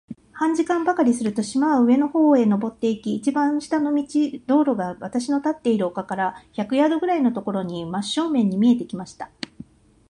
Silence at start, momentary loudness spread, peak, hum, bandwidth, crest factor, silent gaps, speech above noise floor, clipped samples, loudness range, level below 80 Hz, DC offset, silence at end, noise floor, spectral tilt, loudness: 0.1 s; 10 LU; -6 dBFS; none; 11 kHz; 16 dB; none; 24 dB; under 0.1%; 3 LU; -62 dBFS; under 0.1%; 0.85 s; -45 dBFS; -6 dB/octave; -21 LUFS